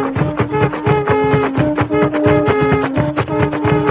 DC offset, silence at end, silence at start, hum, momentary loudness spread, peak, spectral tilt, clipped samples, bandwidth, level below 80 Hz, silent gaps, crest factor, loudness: under 0.1%; 0 s; 0 s; none; 4 LU; 0 dBFS; -11.5 dB/octave; under 0.1%; 4 kHz; -34 dBFS; none; 14 dB; -15 LUFS